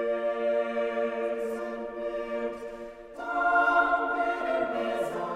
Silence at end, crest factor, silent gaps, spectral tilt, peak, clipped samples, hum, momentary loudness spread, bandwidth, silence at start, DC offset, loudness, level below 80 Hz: 0 s; 18 dB; none; -5 dB/octave; -10 dBFS; under 0.1%; none; 13 LU; 14.5 kHz; 0 s; under 0.1%; -28 LUFS; -60 dBFS